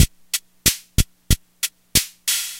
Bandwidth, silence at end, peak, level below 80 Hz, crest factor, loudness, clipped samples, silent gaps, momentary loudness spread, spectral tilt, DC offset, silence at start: 17 kHz; 0 s; 0 dBFS; -28 dBFS; 22 dB; -21 LUFS; under 0.1%; none; 8 LU; -2 dB/octave; under 0.1%; 0 s